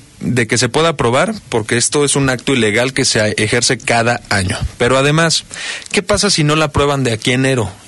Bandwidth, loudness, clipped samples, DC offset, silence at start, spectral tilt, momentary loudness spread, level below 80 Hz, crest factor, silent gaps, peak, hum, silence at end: 12 kHz; -14 LUFS; under 0.1%; under 0.1%; 0.2 s; -3.5 dB/octave; 5 LU; -36 dBFS; 12 dB; none; -2 dBFS; none; 0.1 s